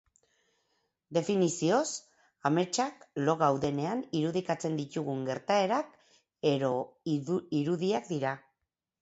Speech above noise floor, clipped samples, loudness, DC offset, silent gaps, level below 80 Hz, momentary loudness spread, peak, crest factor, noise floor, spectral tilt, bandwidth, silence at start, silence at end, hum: 56 dB; under 0.1%; -31 LUFS; under 0.1%; none; -70 dBFS; 7 LU; -12 dBFS; 20 dB; -86 dBFS; -5.5 dB/octave; 8.2 kHz; 1.1 s; 0.65 s; none